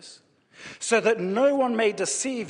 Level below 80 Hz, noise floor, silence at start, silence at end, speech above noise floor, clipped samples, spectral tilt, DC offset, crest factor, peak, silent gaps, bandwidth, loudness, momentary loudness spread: -74 dBFS; -53 dBFS; 0.05 s; 0 s; 30 dB; under 0.1%; -3 dB/octave; under 0.1%; 18 dB; -6 dBFS; none; 10 kHz; -23 LUFS; 14 LU